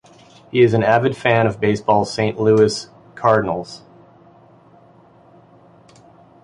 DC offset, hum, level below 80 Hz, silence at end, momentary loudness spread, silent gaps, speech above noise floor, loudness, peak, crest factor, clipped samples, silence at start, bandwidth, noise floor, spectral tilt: under 0.1%; none; -52 dBFS; 2.65 s; 13 LU; none; 33 dB; -17 LUFS; -2 dBFS; 18 dB; under 0.1%; 0.55 s; 11 kHz; -49 dBFS; -6 dB/octave